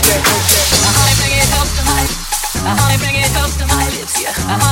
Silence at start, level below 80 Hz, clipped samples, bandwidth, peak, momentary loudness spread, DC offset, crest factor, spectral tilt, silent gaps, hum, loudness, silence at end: 0 s; -22 dBFS; under 0.1%; 17.5 kHz; 0 dBFS; 7 LU; under 0.1%; 14 dB; -2.5 dB/octave; none; none; -12 LUFS; 0 s